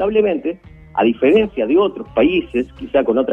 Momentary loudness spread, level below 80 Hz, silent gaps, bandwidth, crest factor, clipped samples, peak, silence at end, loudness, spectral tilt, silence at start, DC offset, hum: 9 LU; -44 dBFS; none; 3.8 kHz; 14 dB; under 0.1%; -2 dBFS; 0 s; -17 LUFS; -8 dB/octave; 0 s; under 0.1%; none